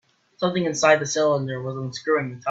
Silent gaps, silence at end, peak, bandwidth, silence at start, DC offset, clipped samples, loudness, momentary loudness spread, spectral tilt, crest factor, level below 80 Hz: none; 0 s; -2 dBFS; 8 kHz; 0.4 s; under 0.1%; under 0.1%; -22 LUFS; 11 LU; -4.5 dB/octave; 20 dB; -64 dBFS